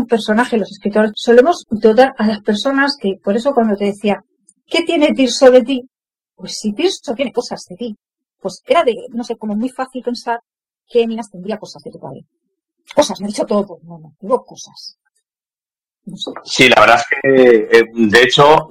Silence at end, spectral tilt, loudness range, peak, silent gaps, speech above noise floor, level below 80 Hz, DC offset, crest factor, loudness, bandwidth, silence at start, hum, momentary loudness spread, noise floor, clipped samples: 0.05 s; -4.5 dB/octave; 10 LU; 0 dBFS; none; over 76 dB; -52 dBFS; under 0.1%; 14 dB; -14 LUFS; 15 kHz; 0 s; none; 19 LU; under -90 dBFS; 0.2%